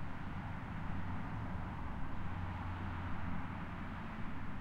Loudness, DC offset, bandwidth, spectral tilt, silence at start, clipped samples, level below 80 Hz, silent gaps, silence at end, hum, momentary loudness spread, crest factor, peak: -44 LUFS; under 0.1%; 7 kHz; -8 dB/octave; 0 s; under 0.1%; -48 dBFS; none; 0 s; none; 2 LU; 14 dB; -26 dBFS